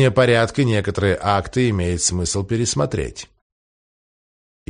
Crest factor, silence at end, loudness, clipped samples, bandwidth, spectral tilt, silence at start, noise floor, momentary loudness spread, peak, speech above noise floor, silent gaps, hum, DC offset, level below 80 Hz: 18 dB; 1.45 s; -19 LUFS; under 0.1%; 10 kHz; -4.5 dB/octave; 0 s; under -90 dBFS; 7 LU; -2 dBFS; over 71 dB; none; none; under 0.1%; -40 dBFS